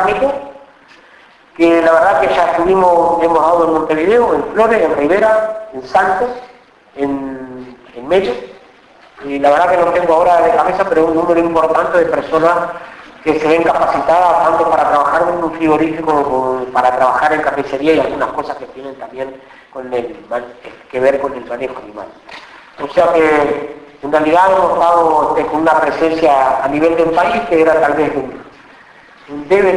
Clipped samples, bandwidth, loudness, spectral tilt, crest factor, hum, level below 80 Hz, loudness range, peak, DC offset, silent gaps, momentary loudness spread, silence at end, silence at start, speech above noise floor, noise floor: under 0.1%; 11 kHz; -13 LUFS; -6 dB/octave; 12 dB; none; -46 dBFS; 8 LU; 0 dBFS; under 0.1%; none; 18 LU; 0 s; 0 s; 31 dB; -44 dBFS